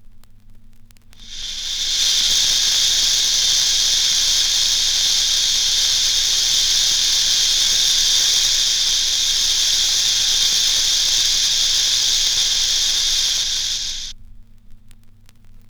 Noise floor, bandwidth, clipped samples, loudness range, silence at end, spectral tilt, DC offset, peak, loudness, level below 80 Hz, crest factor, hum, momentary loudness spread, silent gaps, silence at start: -43 dBFS; over 20 kHz; under 0.1%; 3 LU; 0.1 s; 3 dB/octave; under 0.1%; -4 dBFS; -14 LUFS; -36 dBFS; 14 dB; none; 5 LU; none; 0 s